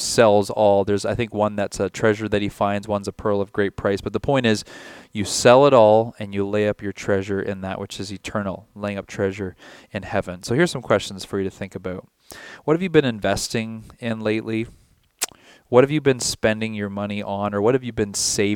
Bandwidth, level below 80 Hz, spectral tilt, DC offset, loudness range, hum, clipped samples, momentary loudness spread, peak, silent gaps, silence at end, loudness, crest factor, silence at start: 18 kHz; -50 dBFS; -4.5 dB/octave; under 0.1%; 7 LU; none; under 0.1%; 15 LU; 0 dBFS; none; 0 s; -21 LUFS; 20 dB; 0 s